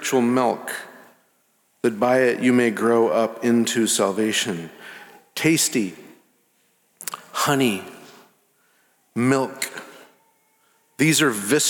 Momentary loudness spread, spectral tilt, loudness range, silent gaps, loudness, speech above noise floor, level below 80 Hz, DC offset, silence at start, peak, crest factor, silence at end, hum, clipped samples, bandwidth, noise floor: 16 LU; -3.5 dB/octave; 7 LU; none; -21 LUFS; 44 dB; -74 dBFS; under 0.1%; 0 s; -6 dBFS; 18 dB; 0 s; none; under 0.1%; 18.5 kHz; -64 dBFS